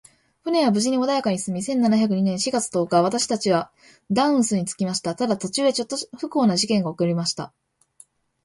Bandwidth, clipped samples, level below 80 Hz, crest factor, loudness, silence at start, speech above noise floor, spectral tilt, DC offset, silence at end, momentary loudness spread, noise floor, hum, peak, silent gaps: 11.5 kHz; under 0.1%; -64 dBFS; 18 dB; -22 LUFS; 0.45 s; 33 dB; -4.5 dB/octave; under 0.1%; 1 s; 7 LU; -55 dBFS; none; -6 dBFS; none